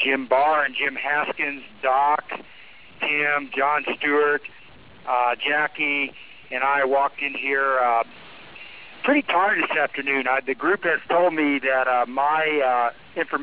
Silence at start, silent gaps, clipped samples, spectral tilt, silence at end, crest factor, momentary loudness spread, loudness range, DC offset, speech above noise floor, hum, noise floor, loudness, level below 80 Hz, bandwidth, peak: 0 s; none; under 0.1%; -7 dB/octave; 0 s; 16 dB; 9 LU; 2 LU; 0.4%; 25 dB; none; -47 dBFS; -22 LUFS; -68 dBFS; 4 kHz; -8 dBFS